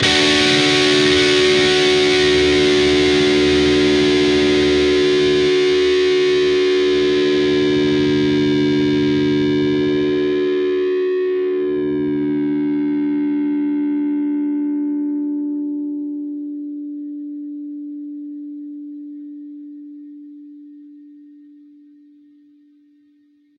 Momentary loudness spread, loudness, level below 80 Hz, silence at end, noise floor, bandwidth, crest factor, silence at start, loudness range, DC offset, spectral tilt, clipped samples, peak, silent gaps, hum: 18 LU; -16 LUFS; -44 dBFS; 2.55 s; -56 dBFS; 11 kHz; 16 dB; 0 s; 18 LU; under 0.1%; -4.5 dB/octave; under 0.1%; -2 dBFS; none; none